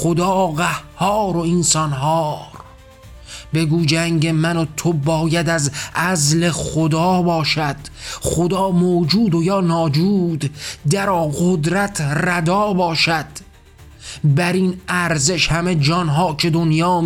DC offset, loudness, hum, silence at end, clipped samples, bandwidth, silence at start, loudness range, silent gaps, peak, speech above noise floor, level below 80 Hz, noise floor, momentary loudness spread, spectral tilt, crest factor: under 0.1%; -17 LUFS; none; 0 s; under 0.1%; 16.5 kHz; 0 s; 2 LU; none; -4 dBFS; 26 dB; -42 dBFS; -43 dBFS; 8 LU; -5 dB/octave; 14 dB